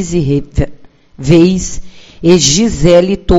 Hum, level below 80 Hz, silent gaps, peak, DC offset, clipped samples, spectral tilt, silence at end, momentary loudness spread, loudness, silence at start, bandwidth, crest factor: none; -24 dBFS; none; 0 dBFS; under 0.1%; 0.9%; -5 dB/octave; 0 s; 14 LU; -10 LUFS; 0 s; 8.2 kHz; 10 dB